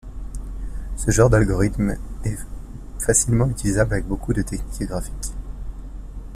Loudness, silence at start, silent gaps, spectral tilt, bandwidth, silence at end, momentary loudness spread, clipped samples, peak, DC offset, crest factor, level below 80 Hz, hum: -21 LUFS; 0.05 s; none; -5.5 dB/octave; 15 kHz; 0 s; 20 LU; under 0.1%; -4 dBFS; under 0.1%; 18 dB; -30 dBFS; none